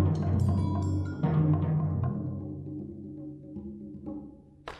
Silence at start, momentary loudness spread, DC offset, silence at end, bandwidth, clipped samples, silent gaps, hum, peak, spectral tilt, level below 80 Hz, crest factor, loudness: 0 s; 16 LU; under 0.1%; 0 s; 8 kHz; under 0.1%; none; none; -14 dBFS; -9.5 dB/octave; -52 dBFS; 16 dB; -30 LUFS